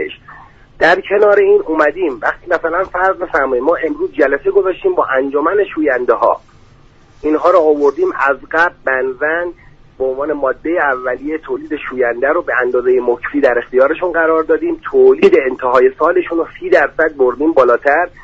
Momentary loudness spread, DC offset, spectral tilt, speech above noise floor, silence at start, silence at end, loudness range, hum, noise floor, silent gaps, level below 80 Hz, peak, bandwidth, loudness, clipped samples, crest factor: 9 LU; under 0.1%; -6 dB/octave; 31 dB; 0 s; 0.15 s; 4 LU; none; -44 dBFS; none; -44 dBFS; 0 dBFS; 7.4 kHz; -14 LUFS; under 0.1%; 14 dB